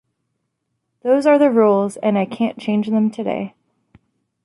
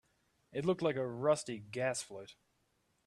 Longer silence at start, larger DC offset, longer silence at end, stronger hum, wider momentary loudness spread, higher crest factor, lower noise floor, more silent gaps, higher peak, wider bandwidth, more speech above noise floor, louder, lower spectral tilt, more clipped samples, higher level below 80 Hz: first, 1.05 s vs 0.55 s; neither; first, 0.95 s vs 0.75 s; neither; about the same, 12 LU vs 14 LU; about the same, 16 dB vs 20 dB; second, -74 dBFS vs -78 dBFS; neither; first, -4 dBFS vs -18 dBFS; second, 11.5 kHz vs 13 kHz; first, 57 dB vs 42 dB; first, -17 LUFS vs -36 LUFS; first, -7 dB/octave vs -5 dB/octave; neither; first, -66 dBFS vs -76 dBFS